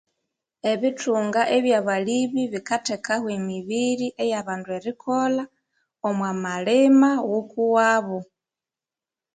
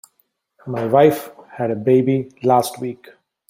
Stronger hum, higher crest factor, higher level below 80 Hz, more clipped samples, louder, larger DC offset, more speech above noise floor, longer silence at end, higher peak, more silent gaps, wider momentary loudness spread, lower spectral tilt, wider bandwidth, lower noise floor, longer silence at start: neither; about the same, 16 dB vs 18 dB; second, -70 dBFS vs -62 dBFS; neither; second, -23 LUFS vs -18 LUFS; neither; first, 68 dB vs 49 dB; first, 1.1 s vs 0.55 s; second, -6 dBFS vs -2 dBFS; neither; second, 11 LU vs 18 LU; second, -5 dB/octave vs -6.5 dB/octave; second, 9.4 kHz vs 16 kHz; first, -90 dBFS vs -66 dBFS; about the same, 0.65 s vs 0.65 s